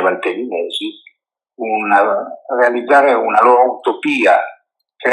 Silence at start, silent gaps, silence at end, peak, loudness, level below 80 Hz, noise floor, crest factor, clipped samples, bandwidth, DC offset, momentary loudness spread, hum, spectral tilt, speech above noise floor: 0 s; none; 0 s; 0 dBFS; -14 LUFS; -80 dBFS; -61 dBFS; 14 dB; under 0.1%; 11.5 kHz; under 0.1%; 11 LU; none; -4 dB/octave; 49 dB